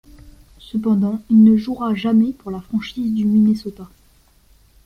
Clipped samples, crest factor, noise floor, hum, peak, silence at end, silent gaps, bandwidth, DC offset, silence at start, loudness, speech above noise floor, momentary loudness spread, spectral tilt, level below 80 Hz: under 0.1%; 14 dB; -53 dBFS; none; -4 dBFS; 1 s; none; 6 kHz; under 0.1%; 0.25 s; -17 LUFS; 37 dB; 13 LU; -8.5 dB/octave; -50 dBFS